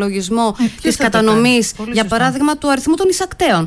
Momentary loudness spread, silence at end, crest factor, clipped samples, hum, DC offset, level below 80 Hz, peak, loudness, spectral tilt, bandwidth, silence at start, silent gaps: 6 LU; 0 s; 12 dB; under 0.1%; none; under 0.1%; -40 dBFS; -2 dBFS; -15 LUFS; -4 dB/octave; 11 kHz; 0 s; none